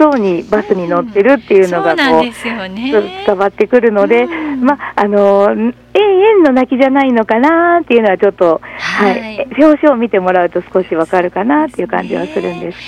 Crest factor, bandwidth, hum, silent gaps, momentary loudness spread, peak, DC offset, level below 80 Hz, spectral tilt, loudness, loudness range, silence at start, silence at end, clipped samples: 10 dB; 12 kHz; none; none; 8 LU; 0 dBFS; under 0.1%; -48 dBFS; -6.5 dB/octave; -11 LUFS; 3 LU; 0 s; 0 s; 0.8%